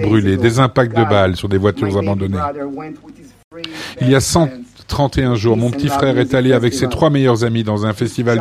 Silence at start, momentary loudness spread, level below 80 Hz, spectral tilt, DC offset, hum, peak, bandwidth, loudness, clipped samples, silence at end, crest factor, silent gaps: 0 s; 13 LU; -38 dBFS; -6 dB/octave; under 0.1%; none; 0 dBFS; 15 kHz; -15 LUFS; under 0.1%; 0 s; 14 dB; 3.44-3.51 s